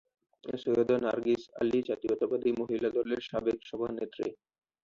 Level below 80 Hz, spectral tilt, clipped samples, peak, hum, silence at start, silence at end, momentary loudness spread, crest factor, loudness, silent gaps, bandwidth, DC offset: -66 dBFS; -7 dB/octave; under 0.1%; -16 dBFS; none; 0.45 s; 0.5 s; 8 LU; 16 dB; -32 LUFS; none; 7.2 kHz; under 0.1%